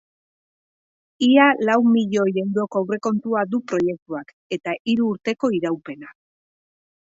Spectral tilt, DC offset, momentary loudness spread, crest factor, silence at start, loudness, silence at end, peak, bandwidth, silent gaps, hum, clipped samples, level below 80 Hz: -6 dB/octave; under 0.1%; 16 LU; 18 dB; 1.2 s; -20 LUFS; 0.9 s; -4 dBFS; 7.8 kHz; 4.02-4.06 s, 4.33-4.50 s, 4.80-4.85 s; none; under 0.1%; -68 dBFS